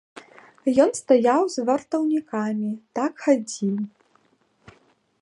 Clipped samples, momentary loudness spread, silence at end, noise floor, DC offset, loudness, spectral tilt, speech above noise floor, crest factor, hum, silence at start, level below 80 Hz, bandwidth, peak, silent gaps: under 0.1%; 10 LU; 1.35 s; -64 dBFS; under 0.1%; -23 LUFS; -5.5 dB/octave; 42 dB; 20 dB; none; 0.15 s; -70 dBFS; 11.5 kHz; -4 dBFS; none